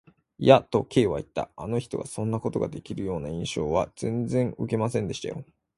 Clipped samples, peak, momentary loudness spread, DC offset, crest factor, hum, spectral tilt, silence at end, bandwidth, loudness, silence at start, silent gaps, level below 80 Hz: under 0.1%; -2 dBFS; 14 LU; under 0.1%; 24 dB; none; -6.5 dB/octave; 0.35 s; 11.5 kHz; -27 LUFS; 0.4 s; none; -52 dBFS